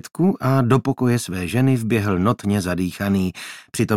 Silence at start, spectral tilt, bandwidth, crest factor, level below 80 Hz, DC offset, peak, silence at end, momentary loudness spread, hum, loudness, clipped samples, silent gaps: 0.05 s; -6.5 dB/octave; 15.5 kHz; 18 dB; -54 dBFS; under 0.1%; -2 dBFS; 0 s; 6 LU; none; -20 LUFS; under 0.1%; none